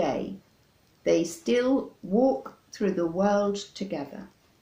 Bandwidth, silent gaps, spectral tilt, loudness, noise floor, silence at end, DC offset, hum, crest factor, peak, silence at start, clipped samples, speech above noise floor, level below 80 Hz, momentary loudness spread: 15.5 kHz; none; -5.5 dB/octave; -27 LUFS; -63 dBFS; 0.35 s; under 0.1%; none; 16 dB; -10 dBFS; 0 s; under 0.1%; 37 dB; -62 dBFS; 15 LU